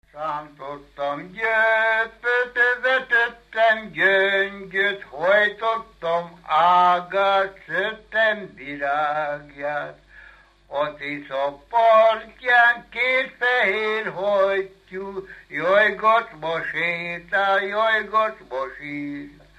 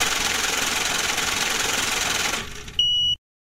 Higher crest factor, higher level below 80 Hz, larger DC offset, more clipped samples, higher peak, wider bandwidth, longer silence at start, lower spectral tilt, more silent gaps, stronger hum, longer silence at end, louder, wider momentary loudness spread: about the same, 16 dB vs 16 dB; second, -58 dBFS vs -46 dBFS; neither; neither; about the same, -6 dBFS vs -8 dBFS; second, 9.6 kHz vs 16 kHz; first, 0.15 s vs 0 s; first, -4.5 dB/octave vs 0 dB/octave; neither; neither; about the same, 0.3 s vs 0.35 s; about the same, -21 LUFS vs -21 LUFS; first, 14 LU vs 4 LU